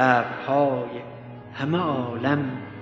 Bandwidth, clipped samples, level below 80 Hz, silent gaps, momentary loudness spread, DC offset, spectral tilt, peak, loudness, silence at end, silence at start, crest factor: 7.6 kHz; under 0.1%; -64 dBFS; none; 16 LU; under 0.1%; -7.5 dB/octave; -4 dBFS; -25 LUFS; 0 s; 0 s; 20 dB